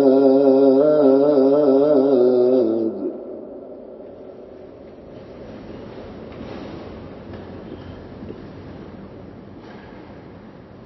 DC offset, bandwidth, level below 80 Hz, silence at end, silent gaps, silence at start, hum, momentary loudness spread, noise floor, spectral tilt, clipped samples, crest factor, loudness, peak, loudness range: under 0.1%; 5.8 kHz; -52 dBFS; 0.45 s; none; 0 s; none; 26 LU; -41 dBFS; -10 dB/octave; under 0.1%; 18 dB; -16 LUFS; -2 dBFS; 21 LU